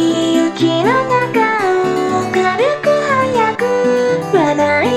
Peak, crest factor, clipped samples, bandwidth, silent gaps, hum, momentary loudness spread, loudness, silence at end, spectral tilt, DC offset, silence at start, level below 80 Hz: -2 dBFS; 12 dB; under 0.1%; 14.5 kHz; none; none; 2 LU; -14 LUFS; 0 s; -5 dB/octave; under 0.1%; 0 s; -54 dBFS